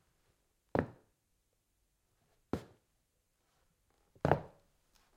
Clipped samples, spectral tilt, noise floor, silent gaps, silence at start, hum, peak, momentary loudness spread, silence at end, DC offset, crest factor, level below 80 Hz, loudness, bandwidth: under 0.1%; -8 dB/octave; -79 dBFS; none; 0.75 s; none; -12 dBFS; 12 LU; 0.7 s; under 0.1%; 32 dB; -64 dBFS; -38 LUFS; 16 kHz